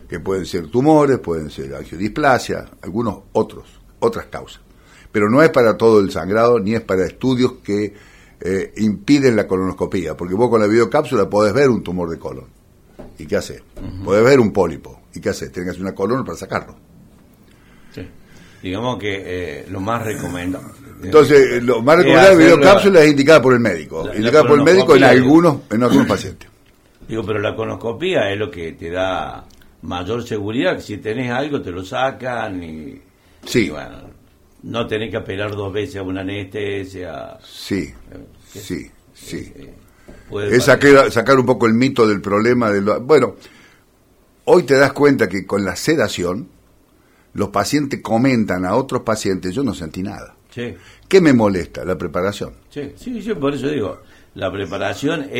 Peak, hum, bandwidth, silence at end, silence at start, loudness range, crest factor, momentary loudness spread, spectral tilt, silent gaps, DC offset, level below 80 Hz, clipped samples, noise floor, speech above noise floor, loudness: 0 dBFS; none; 16.5 kHz; 0 s; 0.1 s; 14 LU; 16 dB; 19 LU; -6 dB/octave; none; under 0.1%; -46 dBFS; under 0.1%; -54 dBFS; 38 dB; -16 LUFS